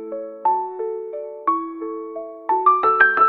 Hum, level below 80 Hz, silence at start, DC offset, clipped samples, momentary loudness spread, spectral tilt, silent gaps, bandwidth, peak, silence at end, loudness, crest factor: none; -72 dBFS; 0 s; under 0.1%; under 0.1%; 16 LU; -6.5 dB/octave; none; 4.7 kHz; 0 dBFS; 0 s; -21 LUFS; 20 dB